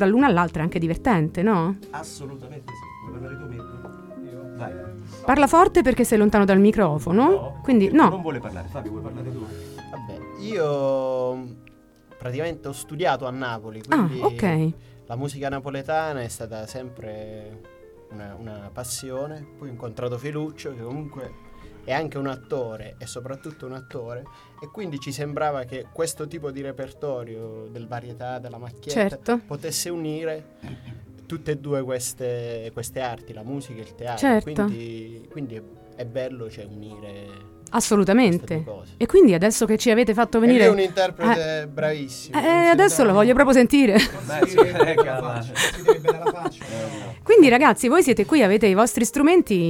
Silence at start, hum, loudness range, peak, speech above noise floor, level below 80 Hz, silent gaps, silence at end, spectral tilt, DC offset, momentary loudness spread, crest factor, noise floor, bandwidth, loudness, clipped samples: 0 s; none; 15 LU; -2 dBFS; 30 dB; -48 dBFS; none; 0 s; -5.5 dB/octave; under 0.1%; 22 LU; 20 dB; -51 dBFS; 17.5 kHz; -20 LUFS; under 0.1%